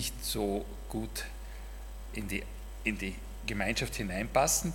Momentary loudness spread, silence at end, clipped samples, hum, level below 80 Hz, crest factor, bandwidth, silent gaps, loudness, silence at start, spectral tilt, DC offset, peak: 17 LU; 0 s; under 0.1%; none; -42 dBFS; 22 dB; 18 kHz; none; -34 LUFS; 0 s; -3.5 dB/octave; under 0.1%; -12 dBFS